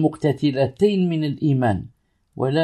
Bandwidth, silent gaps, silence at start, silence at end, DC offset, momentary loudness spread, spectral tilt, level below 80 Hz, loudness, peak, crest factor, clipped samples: 11.5 kHz; none; 0 s; 0 s; under 0.1%; 4 LU; -8 dB/octave; -54 dBFS; -21 LUFS; -4 dBFS; 16 dB; under 0.1%